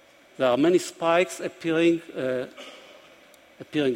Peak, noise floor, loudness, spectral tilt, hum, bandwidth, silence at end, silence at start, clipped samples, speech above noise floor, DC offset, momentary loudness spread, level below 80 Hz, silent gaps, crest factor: -8 dBFS; -53 dBFS; -24 LUFS; -5 dB/octave; none; 16 kHz; 0 s; 0.4 s; under 0.1%; 29 dB; under 0.1%; 12 LU; -70 dBFS; none; 18 dB